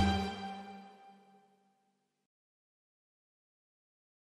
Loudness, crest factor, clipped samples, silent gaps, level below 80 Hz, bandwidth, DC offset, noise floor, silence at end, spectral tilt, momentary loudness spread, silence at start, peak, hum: -39 LUFS; 24 dB; under 0.1%; none; -54 dBFS; 12.5 kHz; under 0.1%; -79 dBFS; 3.25 s; -6 dB/octave; 25 LU; 0 s; -18 dBFS; none